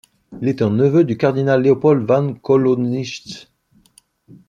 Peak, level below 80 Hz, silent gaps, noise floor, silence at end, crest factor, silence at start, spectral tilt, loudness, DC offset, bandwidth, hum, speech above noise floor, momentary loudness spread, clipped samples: -2 dBFS; -60 dBFS; none; -55 dBFS; 1.1 s; 16 dB; 0.3 s; -8 dB/octave; -16 LUFS; under 0.1%; 10.5 kHz; none; 39 dB; 13 LU; under 0.1%